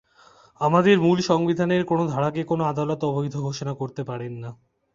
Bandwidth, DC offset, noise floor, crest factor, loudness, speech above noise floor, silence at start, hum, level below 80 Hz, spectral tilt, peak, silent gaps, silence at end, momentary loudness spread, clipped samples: 7.6 kHz; under 0.1%; -54 dBFS; 18 dB; -23 LUFS; 32 dB; 0.6 s; none; -60 dBFS; -7 dB/octave; -4 dBFS; none; 0.4 s; 14 LU; under 0.1%